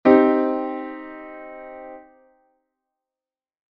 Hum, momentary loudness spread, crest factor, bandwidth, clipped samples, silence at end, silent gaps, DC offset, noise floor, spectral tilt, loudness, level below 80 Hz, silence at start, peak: none; 24 LU; 22 dB; 5.2 kHz; under 0.1%; 1.75 s; none; under 0.1%; under -90 dBFS; -4.5 dB/octave; -20 LUFS; -64 dBFS; 0.05 s; 0 dBFS